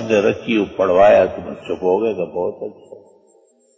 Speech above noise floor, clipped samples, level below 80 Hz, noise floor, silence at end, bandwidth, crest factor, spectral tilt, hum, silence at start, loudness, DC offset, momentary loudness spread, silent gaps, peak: 38 dB; under 0.1%; -50 dBFS; -55 dBFS; 0.8 s; 8 kHz; 14 dB; -6 dB/octave; none; 0 s; -17 LUFS; under 0.1%; 17 LU; none; -4 dBFS